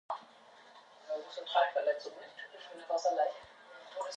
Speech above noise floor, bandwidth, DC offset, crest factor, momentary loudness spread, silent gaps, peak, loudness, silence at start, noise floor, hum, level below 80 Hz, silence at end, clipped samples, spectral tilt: 24 dB; 10 kHz; under 0.1%; 22 dB; 23 LU; none; -16 dBFS; -35 LUFS; 0.1 s; -59 dBFS; none; -86 dBFS; 0 s; under 0.1%; -1 dB/octave